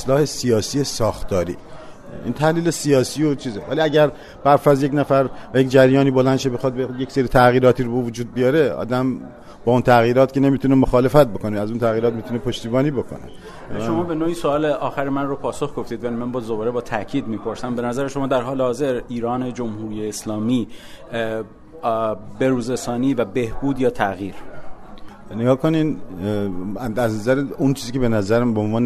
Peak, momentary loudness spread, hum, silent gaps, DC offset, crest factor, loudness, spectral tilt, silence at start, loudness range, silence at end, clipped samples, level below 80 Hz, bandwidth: 0 dBFS; 12 LU; none; none; under 0.1%; 18 dB; -20 LUFS; -6.5 dB/octave; 0 s; 7 LU; 0 s; under 0.1%; -40 dBFS; 13.5 kHz